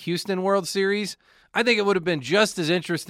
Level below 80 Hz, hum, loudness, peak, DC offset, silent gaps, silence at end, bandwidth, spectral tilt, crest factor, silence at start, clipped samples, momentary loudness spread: -66 dBFS; none; -23 LUFS; -6 dBFS; under 0.1%; none; 0 s; 16 kHz; -4 dB/octave; 18 dB; 0 s; under 0.1%; 8 LU